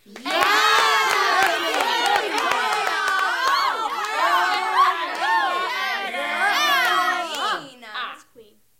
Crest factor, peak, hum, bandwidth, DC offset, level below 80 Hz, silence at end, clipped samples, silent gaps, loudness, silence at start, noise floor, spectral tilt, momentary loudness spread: 18 dB; -4 dBFS; none; 17 kHz; under 0.1%; -68 dBFS; 0.35 s; under 0.1%; none; -20 LUFS; 0.1 s; -52 dBFS; 0 dB/octave; 8 LU